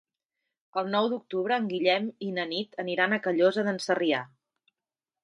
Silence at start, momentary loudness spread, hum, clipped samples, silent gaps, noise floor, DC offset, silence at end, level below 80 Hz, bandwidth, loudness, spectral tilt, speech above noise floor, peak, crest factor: 0.75 s; 8 LU; none; under 0.1%; none; under -90 dBFS; under 0.1%; 0.95 s; -80 dBFS; 11.5 kHz; -28 LUFS; -5 dB/octave; over 63 dB; -8 dBFS; 20 dB